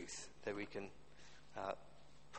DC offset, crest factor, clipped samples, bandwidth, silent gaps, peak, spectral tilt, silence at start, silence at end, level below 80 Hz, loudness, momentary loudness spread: 0.2%; 22 dB; under 0.1%; 8.4 kHz; none; -28 dBFS; -3.5 dB/octave; 0 s; 0 s; -72 dBFS; -49 LUFS; 17 LU